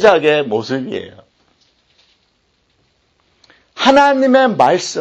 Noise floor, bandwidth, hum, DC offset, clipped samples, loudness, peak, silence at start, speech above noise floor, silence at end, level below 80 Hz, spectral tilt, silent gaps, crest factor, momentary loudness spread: -61 dBFS; 8.4 kHz; none; under 0.1%; under 0.1%; -13 LUFS; 0 dBFS; 0 s; 49 dB; 0 s; -56 dBFS; -4 dB/octave; none; 16 dB; 14 LU